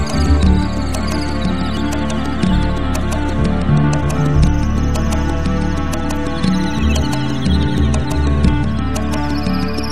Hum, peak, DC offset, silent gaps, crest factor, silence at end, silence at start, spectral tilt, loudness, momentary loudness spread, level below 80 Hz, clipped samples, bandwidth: none; 0 dBFS; 6%; none; 16 dB; 0 s; 0 s; -6.5 dB/octave; -17 LUFS; 5 LU; -20 dBFS; under 0.1%; 14.5 kHz